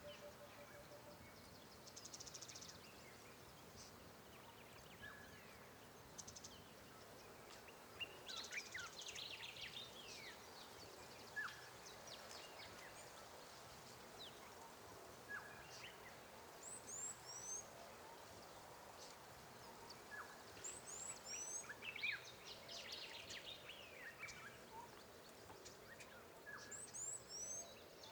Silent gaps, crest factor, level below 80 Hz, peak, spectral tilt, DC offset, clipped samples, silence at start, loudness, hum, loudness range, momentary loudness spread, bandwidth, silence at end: none; 22 dB; -80 dBFS; -34 dBFS; -1 dB/octave; under 0.1%; under 0.1%; 0 s; -54 LUFS; none; 8 LU; 11 LU; over 20 kHz; 0 s